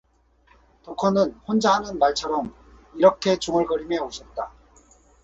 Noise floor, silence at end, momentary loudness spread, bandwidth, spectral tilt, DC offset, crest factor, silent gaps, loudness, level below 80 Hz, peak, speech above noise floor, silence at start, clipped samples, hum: -60 dBFS; 0.75 s; 15 LU; 8 kHz; -5 dB/octave; under 0.1%; 22 dB; none; -23 LUFS; -52 dBFS; -2 dBFS; 38 dB; 0.85 s; under 0.1%; none